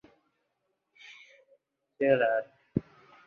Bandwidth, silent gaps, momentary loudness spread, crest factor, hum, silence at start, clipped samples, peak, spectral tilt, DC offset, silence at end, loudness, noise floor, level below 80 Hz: 6.6 kHz; none; 25 LU; 22 dB; none; 1.1 s; under 0.1%; -12 dBFS; -8 dB/octave; under 0.1%; 0.45 s; -29 LUFS; -80 dBFS; -62 dBFS